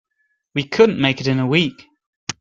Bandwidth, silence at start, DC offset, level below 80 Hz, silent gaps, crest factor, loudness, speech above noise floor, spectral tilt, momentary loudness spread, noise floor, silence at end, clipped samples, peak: 7.6 kHz; 0.55 s; under 0.1%; -56 dBFS; 2.06-2.27 s; 18 dB; -18 LUFS; 52 dB; -5.5 dB/octave; 14 LU; -69 dBFS; 0.1 s; under 0.1%; -2 dBFS